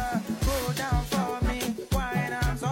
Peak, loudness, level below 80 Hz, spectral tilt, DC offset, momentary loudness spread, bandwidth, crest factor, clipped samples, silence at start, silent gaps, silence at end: -14 dBFS; -28 LUFS; -34 dBFS; -5 dB/octave; under 0.1%; 2 LU; 16.5 kHz; 14 dB; under 0.1%; 0 s; none; 0 s